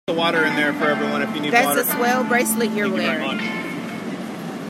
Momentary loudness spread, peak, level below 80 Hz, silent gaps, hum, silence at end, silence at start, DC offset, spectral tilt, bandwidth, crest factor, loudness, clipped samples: 11 LU; -2 dBFS; -68 dBFS; none; none; 0 s; 0.1 s; under 0.1%; -3.5 dB/octave; 16 kHz; 20 dB; -20 LUFS; under 0.1%